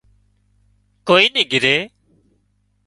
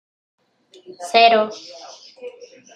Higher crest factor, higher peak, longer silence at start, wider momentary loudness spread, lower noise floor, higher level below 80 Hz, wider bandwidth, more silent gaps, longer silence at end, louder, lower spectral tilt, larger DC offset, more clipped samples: about the same, 20 dB vs 20 dB; about the same, 0 dBFS vs -2 dBFS; first, 1.05 s vs 0.9 s; second, 17 LU vs 25 LU; first, -64 dBFS vs -39 dBFS; first, -60 dBFS vs -80 dBFS; about the same, 11.5 kHz vs 11 kHz; neither; first, 1 s vs 0.45 s; about the same, -14 LUFS vs -16 LUFS; about the same, -3.5 dB/octave vs -2.5 dB/octave; neither; neither